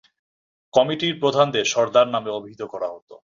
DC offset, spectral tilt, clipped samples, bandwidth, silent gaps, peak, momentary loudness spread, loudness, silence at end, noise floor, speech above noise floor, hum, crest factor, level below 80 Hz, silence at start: under 0.1%; -4 dB/octave; under 0.1%; 7.4 kHz; 3.02-3.07 s; -2 dBFS; 13 LU; -21 LUFS; 0.15 s; under -90 dBFS; over 69 dB; none; 20 dB; -64 dBFS; 0.75 s